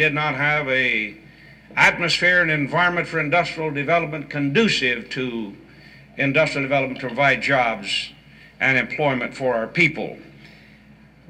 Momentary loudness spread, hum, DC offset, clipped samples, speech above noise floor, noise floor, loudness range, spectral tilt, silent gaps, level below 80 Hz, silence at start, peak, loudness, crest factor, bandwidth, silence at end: 11 LU; none; under 0.1%; under 0.1%; 28 dB; -49 dBFS; 3 LU; -4.5 dB/octave; none; -54 dBFS; 0 s; -4 dBFS; -20 LUFS; 18 dB; 14 kHz; 0.8 s